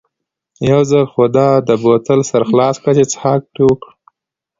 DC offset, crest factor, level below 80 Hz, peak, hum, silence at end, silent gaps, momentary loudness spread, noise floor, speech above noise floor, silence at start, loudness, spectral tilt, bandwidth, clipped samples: under 0.1%; 14 dB; -50 dBFS; 0 dBFS; none; 0.85 s; none; 4 LU; -77 dBFS; 65 dB; 0.6 s; -13 LUFS; -6.5 dB/octave; 7.8 kHz; under 0.1%